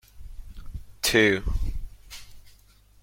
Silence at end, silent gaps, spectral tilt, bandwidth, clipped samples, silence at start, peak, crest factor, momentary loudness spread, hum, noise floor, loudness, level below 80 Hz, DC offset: 0.55 s; none; -3.5 dB/octave; 16.5 kHz; under 0.1%; 0.15 s; -8 dBFS; 20 dB; 24 LU; 50 Hz at -50 dBFS; -55 dBFS; -24 LUFS; -36 dBFS; under 0.1%